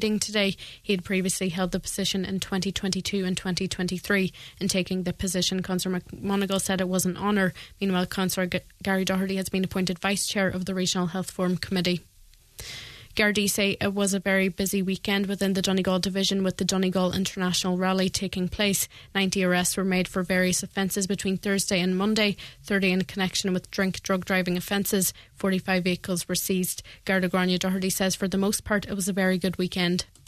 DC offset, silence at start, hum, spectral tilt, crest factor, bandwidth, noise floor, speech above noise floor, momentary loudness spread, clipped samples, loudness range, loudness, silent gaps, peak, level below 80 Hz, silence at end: under 0.1%; 0 s; none; -4 dB/octave; 18 dB; 14 kHz; -50 dBFS; 24 dB; 5 LU; under 0.1%; 2 LU; -26 LUFS; none; -8 dBFS; -52 dBFS; 0.25 s